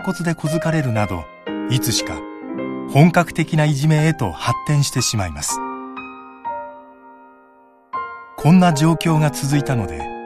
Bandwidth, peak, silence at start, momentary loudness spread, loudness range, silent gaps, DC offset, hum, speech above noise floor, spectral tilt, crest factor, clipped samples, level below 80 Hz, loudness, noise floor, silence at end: 14 kHz; 0 dBFS; 0 s; 16 LU; 7 LU; none; under 0.1%; none; 33 dB; -5.5 dB/octave; 18 dB; under 0.1%; -44 dBFS; -18 LUFS; -50 dBFS; 0 s